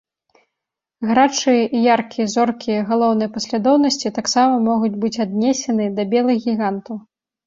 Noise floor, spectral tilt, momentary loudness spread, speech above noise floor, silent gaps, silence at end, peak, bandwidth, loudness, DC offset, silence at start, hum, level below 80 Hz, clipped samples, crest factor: -83 dBFS; -4.5 dB/octave; 7 LU; 66 dB; none; 0.45 s; -2 dBFS; 7.8 kHz; -18 LUFS; under 0.1%; 1 s; none; -62 dBFS; under 0.1%; 16 dB